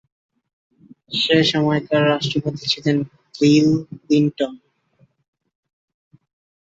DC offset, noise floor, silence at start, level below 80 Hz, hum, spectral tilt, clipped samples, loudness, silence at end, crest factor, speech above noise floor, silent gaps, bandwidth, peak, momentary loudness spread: under 0.1%; -60 dBFS; 1.1 s; -58 dBFS; none; -5.5 dB/octave; under 0.1%; -18 LUFS; 2.2 s; 18 dB; 42 dB; none; 7.8 kHz; -2 dBFS; 9 LU